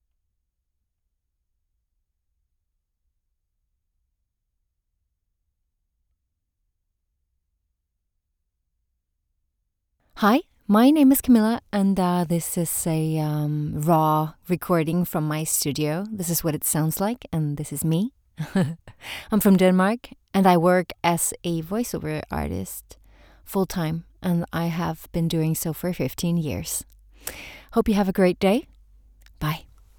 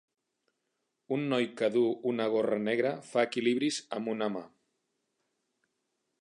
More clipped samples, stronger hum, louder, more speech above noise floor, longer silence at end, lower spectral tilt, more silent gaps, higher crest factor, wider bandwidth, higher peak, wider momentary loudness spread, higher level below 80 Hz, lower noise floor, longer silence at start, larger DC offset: neither; neither; first, -23 LUFS vs -31 LUFS; about the same, 55 dB vs 52 dB; second, 0.4 s vs 1.75 s; about the same, -5.5 dB/octave vs -5 dB/octave; neither; about the same, 20 dB vs 20 dB; first, over 20 kHz vs 11 kHz; first, -6 dBFS vs -14 dBFS; first, 12 LU vs 7 LU; first, -50 dBFS vs -84 dBFS; second, -77 dBFS vs -82 dBFS; first, 10.15 s vs 1.1 s; neither